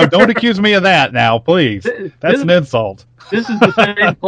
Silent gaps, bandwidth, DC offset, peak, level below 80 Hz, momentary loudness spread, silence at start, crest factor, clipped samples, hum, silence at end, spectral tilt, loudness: none; 10 kHz; under 0.1%; 0 dBFS; -48 dBFS; 10 LU; 0 s; 12 dB; 0.4%; none; 0 s; -6 dB/octave; -12 LUFS